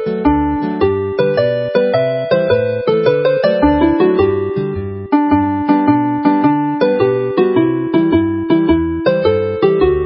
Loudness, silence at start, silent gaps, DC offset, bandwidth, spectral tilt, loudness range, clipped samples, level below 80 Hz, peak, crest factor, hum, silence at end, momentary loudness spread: -14 LUFS; 0 s; none; under 0.1%; 5.8 kHz; -12.5 dB/octave; 1 LU; under 0.1%; -34 dBFS; 0 dBFS; 14 dB; none; 0 s; 3 LU